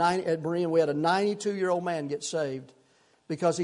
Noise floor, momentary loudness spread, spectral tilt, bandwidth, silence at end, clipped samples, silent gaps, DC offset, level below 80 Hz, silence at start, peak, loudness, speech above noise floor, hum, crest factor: -64 dBFS; 7 LU; -5 dB/octave; 11 kHz; 0 s; under 0.1%; none; under 0.1%; -74 dBFS; 0 s; -12 dBFS; -28 LUFS; 37 dB; none; 16 dB